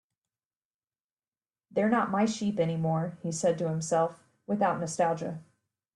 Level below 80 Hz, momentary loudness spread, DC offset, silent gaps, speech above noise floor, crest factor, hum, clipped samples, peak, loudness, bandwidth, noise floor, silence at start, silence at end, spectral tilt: -70 dBFS; 9 LU; under 0.1%; none; over 62 dB; 18 dB; none; under 0.1%; -14 dBFS; -29 LUFS; 11.5 kHz; under -90 dBFS; 1.75 s; 0.55 s; -6 dB/octave